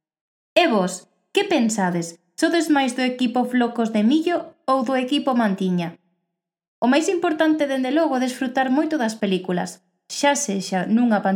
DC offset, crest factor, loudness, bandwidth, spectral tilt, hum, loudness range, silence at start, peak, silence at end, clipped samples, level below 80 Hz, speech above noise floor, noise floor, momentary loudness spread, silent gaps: under 0.1%; 18 dB; -21 LUFS; 16.5 kHz; -4.5 dB/octave; none; 1 LU; 0.55 s; -2 dBFS; 0 s; under 0.1%; -82 dBFS; 60 dB; -80 dBFS; 7 LU; 6.68-6.82 s